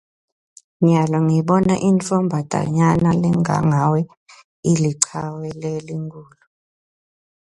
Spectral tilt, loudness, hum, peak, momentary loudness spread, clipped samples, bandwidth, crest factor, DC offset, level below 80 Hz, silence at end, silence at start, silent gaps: -6.5 dB/octave; -18 LUFS; none; 0 dBFS; 12 LU; under 0.1%; 11.5 kHz; 20 dB; under 0.1%; -50 dBFS; 1.3 s; 0.8 s; 4.17-4.26 s, 4.44-4.63 s